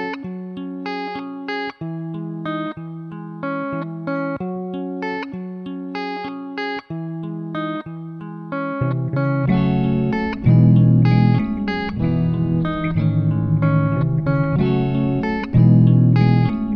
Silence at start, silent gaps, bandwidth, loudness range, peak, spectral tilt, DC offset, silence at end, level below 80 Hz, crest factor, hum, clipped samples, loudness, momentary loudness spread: 0 s; none; 5.6 kHz; 11 LU; -4 dBFS; -10 dB/octave; under 0.1%; 0 s; -40 dBFS; 16 dB; none; under 0.1%; -20 LUFS; 15 LU